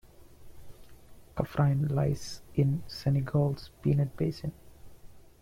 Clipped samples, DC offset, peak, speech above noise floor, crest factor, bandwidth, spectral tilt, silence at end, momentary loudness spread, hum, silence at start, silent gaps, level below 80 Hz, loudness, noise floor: under 0.1%; under 0.1%; -12 dBFS; 22 dB; 20 dB; 13.5 kHz; -8 dB/octave; 0.2 s; 9 LU; none; 0.2 s; none; -52 dBFS; -30 LUFS; -51 dBFS